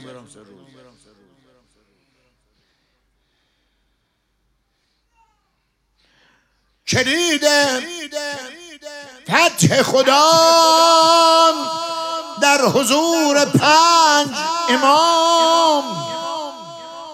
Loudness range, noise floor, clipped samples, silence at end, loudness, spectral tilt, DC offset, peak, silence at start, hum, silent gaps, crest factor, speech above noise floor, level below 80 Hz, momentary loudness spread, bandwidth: 7 LU; -68 dBFS; under 0.1%; 0 s; -14 LUFS; -3 dB/octave; under 0.1%; 0 dBFS; 0 s; none; none; 18 dB; 53 dB; -64 dBFS; 20 LU; 16.5 kHz